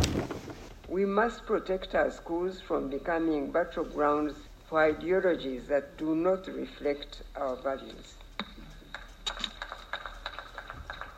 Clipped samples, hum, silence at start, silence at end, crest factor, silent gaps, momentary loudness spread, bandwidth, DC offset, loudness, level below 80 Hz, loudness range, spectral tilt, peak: under 0.1%; none; 0 s; 0 s; 22 dB; none; 16 LU; 16 kHz; under 0.1%; -32 LUFS; -50 dBFS; 8 LU; -5 dB/octave; -10 dBFS